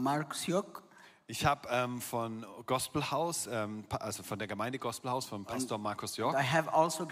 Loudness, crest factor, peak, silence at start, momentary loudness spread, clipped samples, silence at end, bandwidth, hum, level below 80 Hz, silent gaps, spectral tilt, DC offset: -34 LUFS; 20 dB; -14 dBFS; 0 s; 9 LU; under 0.1%; 0 s; 16 kHz; none; -64 dBFS; none; -4 dB/octave; under 0.1%